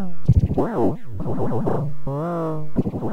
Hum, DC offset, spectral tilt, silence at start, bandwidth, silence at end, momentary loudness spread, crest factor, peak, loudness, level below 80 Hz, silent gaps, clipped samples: none; under 0.1%; -10.5 dB/octave; 0 s; 10 kHz; 0 s; 8 LU; 16 dB; -4 dBFS; -23 LUFS; -32 dBFS; none; under 0.1%